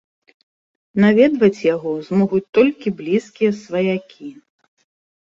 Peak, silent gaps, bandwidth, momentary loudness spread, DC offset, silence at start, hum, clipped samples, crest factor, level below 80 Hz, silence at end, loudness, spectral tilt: -2 dBFS; 2.49-2.53 s; 7.6 kHz; 13 LU; under 0.1%; 0.95 s; none; under 0.1%; 16 dB; -60 dBFS; 0.9 s; -18 LUFS; -7.5 dB/octave